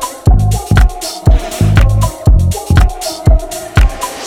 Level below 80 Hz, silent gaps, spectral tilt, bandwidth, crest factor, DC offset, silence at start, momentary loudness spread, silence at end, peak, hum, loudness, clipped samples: -12 dBFS; none; -5.5 dB/octave; 16 kHz; 10 dB; under 0.1%; 0 s; 5 LU; 0 s; 0 dBFS; none; -12 LUFS; under 0.1%